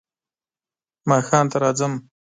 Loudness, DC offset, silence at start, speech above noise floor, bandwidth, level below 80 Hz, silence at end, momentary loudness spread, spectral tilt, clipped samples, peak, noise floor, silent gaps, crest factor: -20 LUFS; under 0.1%; 1.05 s; over 71 dB; 9.6 kHz; -66 dBFS; 0.35 s; 12 LU; -5.5 dB/octave; under 0.1%; -4 dBFS; under -90 dBFS; none; 20 dB